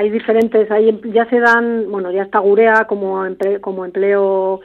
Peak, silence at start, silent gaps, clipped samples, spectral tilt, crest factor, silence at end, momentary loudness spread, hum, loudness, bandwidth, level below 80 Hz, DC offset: 0 dBFS; 0 s; none; under 0.1%; -7 dB/octave; 14 dB; 0 s; 8 LU; none; -14 LUFS; 7.2 kHz; -60 dBFS; under 0.1%